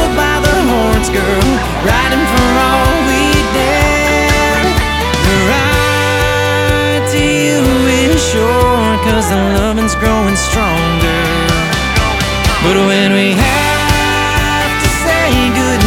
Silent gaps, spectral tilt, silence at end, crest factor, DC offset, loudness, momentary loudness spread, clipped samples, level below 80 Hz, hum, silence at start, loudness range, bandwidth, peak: none; -4.5 dB/octave; 0 s; 12 dB; under 0.1%; -11 LUFS; 2 LU; under 0.1%; -20 dBFS; none; 0 s; 1 LU; 18.5 kHz; 0 dBFS